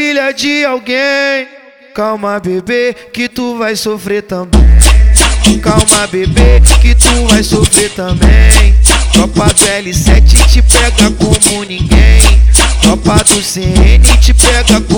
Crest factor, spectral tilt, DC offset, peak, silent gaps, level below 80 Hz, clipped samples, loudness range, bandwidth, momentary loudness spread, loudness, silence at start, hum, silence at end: 6 dB; -4 dB/octave; under 0.1%; 0 dBFS; none; -8 dBFS; 3%; 6 LU; over 20 kHz; 10 LU; -8 LUFS; 0 s; none; 0 s